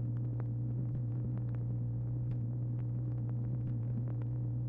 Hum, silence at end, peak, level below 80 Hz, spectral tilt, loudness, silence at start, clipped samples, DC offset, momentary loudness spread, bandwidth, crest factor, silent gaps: none; 0 s; -26 dBFS; -52 dBFS; -13 dB/octave; -37 LUFS; 0 s; under 0.1%; under 0.1%; 0 LU; 1.9 kHz; 10 dB; none